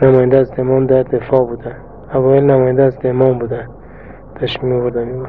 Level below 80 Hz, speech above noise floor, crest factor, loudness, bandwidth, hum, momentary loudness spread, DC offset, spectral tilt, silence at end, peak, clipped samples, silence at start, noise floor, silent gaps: -40 dBFS; 22 dB; 14 dB; -14 LUFS; 4.9 kHz; none; 14 LU; 0.8%; -10.5 dB/octave; 0 s; 0 dBFS; under 0.1%; 0 s; -35 dBFS; none